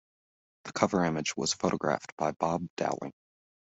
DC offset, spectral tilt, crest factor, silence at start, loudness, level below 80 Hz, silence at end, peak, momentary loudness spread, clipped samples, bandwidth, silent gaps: under 0.1%; -4.5 dB/octave; 24 dB; 0.65 s; -31 LUFS; -66 dBFS; 0.6 s; -8 dBFS; 11 LU; under 0.1%; 8.2 kHz; 2.12-2.17 s, 2.70-2.77 s